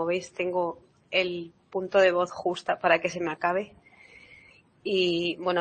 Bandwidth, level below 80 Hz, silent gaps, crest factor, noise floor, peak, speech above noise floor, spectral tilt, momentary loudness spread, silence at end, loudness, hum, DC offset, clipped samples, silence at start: 8.8 kHz; -68 dBFS; none; 22 dB; -56 dBFS; -6 dBFS; 29 dB; -4.5 dB/octave; 13 LU; 0 s; -27 LUFS; none; under 0.1%; under 0.1%; 0 s